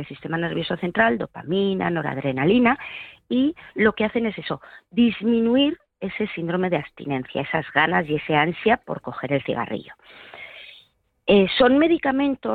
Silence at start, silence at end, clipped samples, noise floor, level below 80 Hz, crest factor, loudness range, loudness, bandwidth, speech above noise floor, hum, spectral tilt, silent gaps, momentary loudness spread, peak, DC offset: 0 s; 0 s; under 0.1%; -58 dBFS; -54 dBFS; 16 dB; 2 LU; -22 LUFS; 4.7 kHz; 36 dB; none; -8.5 dB/octave; none; 14 LU; -6 dBFS; under 0.1%